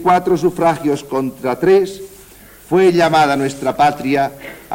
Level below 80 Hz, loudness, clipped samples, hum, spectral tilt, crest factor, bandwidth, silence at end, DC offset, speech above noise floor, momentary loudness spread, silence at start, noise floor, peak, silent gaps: -48 dBFS; -15 LUFS; under 0.1%; none; -6 dB/octave; 14 dB; 17 kHz; 0 s; under 0.1%; 26 dB; 10 LU; 0 s; -41 dBFS; -2 dBFS; none